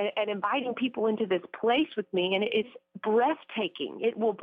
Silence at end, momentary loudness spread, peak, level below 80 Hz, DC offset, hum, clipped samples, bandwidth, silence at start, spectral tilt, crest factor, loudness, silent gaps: 0 s; 6 LU; -16 dBFS; -76 dBFS; under 0.1%; none; under 0.1%; 4.8 kHz; 0 s; -7.5 dB/octave; 12 dB; -29 LUFS; none